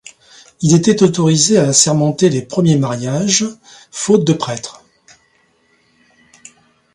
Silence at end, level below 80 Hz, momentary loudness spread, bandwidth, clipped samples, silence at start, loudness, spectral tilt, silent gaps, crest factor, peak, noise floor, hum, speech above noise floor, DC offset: 2.2 s; -54 dBFS; 12 LU; 11.5 kHz; under 0.1%; 0.6 s; -13 LUFS; -4.5 dB/octave; none; 16 dB; 0 dBFS; -57 dBFS; none; 44 dB; under 0.1%